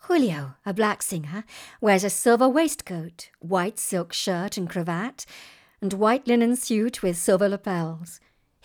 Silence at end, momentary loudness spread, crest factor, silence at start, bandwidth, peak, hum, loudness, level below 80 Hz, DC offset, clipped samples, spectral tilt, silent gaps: 0.5 s; 16 LU; 18 dB; 0.05 s; over 20 kHz; -6 dBFS; none; -24 LUFS; -62 dBFS; under 0.1%; under 0.1%; -4.5 dB/octave; none